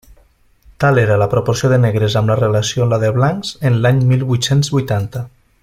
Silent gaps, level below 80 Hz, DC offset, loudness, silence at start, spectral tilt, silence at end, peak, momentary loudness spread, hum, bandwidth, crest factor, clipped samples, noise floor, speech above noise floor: none; -44 dBFS; under 0.1%; -15 LUFS; 0.8 s; -6 dB/octave; 0.35 s; -2 dBFS; 6 LU; none; 15 kHz; 14 dB; under 0.1%; -51 dBFS; 38 dB